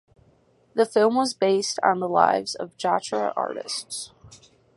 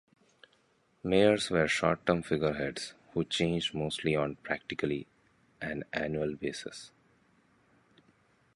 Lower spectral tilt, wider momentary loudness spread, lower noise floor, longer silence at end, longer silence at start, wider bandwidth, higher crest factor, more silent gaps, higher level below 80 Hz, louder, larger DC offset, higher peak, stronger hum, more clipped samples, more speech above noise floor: second, -3.5 dB/octave vs -5 dB/octave; second, 11 LU vs 15 LU; second, -61 dBFS vs -70 dBFS; second, 0.4 s vs 1.7 s; second, 0.75 s vs 1.05 s; about the same, 11.5 kHz vs 11.5 kHz; about the same, 22 dB vs 22 dB; neither; second, -68 dBFS vs -58 dBFS; first, -24 LUFS vs -31 LUFS; neither; first, -4 dBFS vs -10 dBFS; neither; neither; about the same, 38 dB vs 39 dB